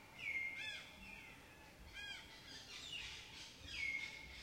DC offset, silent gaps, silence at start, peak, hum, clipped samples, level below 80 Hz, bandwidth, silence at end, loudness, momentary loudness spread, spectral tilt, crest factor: under 0.1%; none; 0 s; -32 dBFS; none; under 0.1%; -68 dBFS; 16 kHz; 0 s; -47 LUFS; 13 LU; -1.5 dB/octave; 18 dB